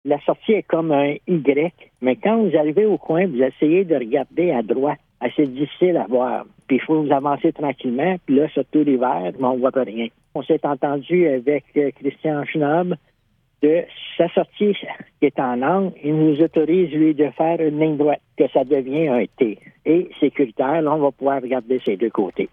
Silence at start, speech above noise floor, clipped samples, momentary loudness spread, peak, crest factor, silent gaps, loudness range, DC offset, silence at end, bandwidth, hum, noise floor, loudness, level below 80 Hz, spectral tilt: 0.05 s; 45 dB; under 0.1%; 6 LU; -2 dBFS; 16 dB; none; 3 LU; under 0.1%; 0.05 s; 3.8 kHz; none; -64 dBFS; -20 LUFS; -64 dBFS; -10 dB/octave